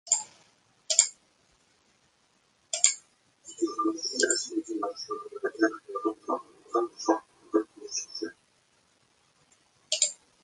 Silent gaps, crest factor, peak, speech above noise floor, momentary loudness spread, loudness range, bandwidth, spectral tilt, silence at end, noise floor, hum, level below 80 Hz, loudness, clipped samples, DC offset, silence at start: none; 32 dB; 0 dBFS; 38 dB; 13 LU; 4 LU; 11.5 kHz; 0.5 dB/octave; 0.3 s; -68 dBFS; none; -80 dBFS; -29 LUFS; under 0.1%; under 0.1%; 0.05 s